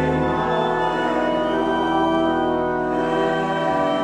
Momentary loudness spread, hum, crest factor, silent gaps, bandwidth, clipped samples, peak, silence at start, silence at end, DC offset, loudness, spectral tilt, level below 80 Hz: 2 LU; none; 14 dB; none; 10.5 kHz; under 0.1%; -6 dBFS; 0 s; 0 s; under 0.1%; -20 LUFS; -6.5 dB/octave; -44 dBFS